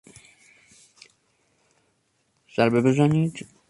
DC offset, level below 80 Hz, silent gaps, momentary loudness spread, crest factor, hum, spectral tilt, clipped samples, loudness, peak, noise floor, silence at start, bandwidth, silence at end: under 0.1%; -62 dBFS; none; 9 LU; 20 dB; none; -7.5 dB/octave; under 0.1%; -22 LUFS; -6 dBFS; -70 dBFS; 2.6 s; 11.5 kHz; 0.25 s